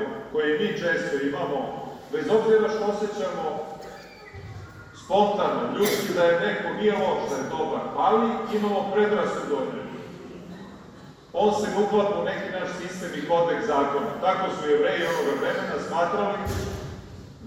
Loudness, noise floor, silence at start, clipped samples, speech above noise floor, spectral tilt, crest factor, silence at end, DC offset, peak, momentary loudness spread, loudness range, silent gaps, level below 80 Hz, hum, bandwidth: -25 LUFS; -46 dBFS; 0 s; under 0.1%; 22 dB; -5 dB/octave; 18 dB; 0 s; under 0.1%; -8 dBFS; 19 LU; 3 LU; none; -52 dBFS; none; 16 kHz